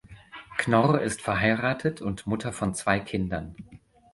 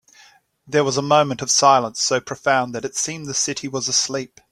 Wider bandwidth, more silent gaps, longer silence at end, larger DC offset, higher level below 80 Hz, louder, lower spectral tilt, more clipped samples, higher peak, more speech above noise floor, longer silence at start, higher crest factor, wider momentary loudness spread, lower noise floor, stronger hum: second, 11.5 kHz vs 15 kHz; neither; about the same, 0.35 s vs 0.25 s; neither; first, -50 dBFS vs -62 dBFS; second, -26 LUFS vs -19 LUFS; first, -5.5 dB/octave vs -2.5 dB/octave; neither; second, -6 dBFS vs -2 dBFS; second, 21 dB vs 32 dB; second, 0.1 s vs 0.7 s; about the same, 20 dB vs 18 dB; first, 16 LU vs 9 LU; second, -47 dBFS vs -52 dBFS; neither